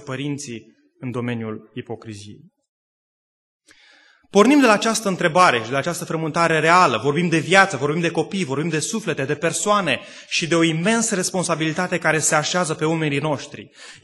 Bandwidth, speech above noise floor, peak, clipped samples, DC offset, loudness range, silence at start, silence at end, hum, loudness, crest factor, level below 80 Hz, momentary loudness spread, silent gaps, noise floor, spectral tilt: 12.5 kHz; 33 dB; 0 dBFS; under 0.1%; under 0.1%; 14 LU; 0 s; 0.1 s; none; -19 LUFS; 20 dB; -64 dBFS; 17 LU; 2.69-3.60 s; -53 dBFS; -4 dB/octave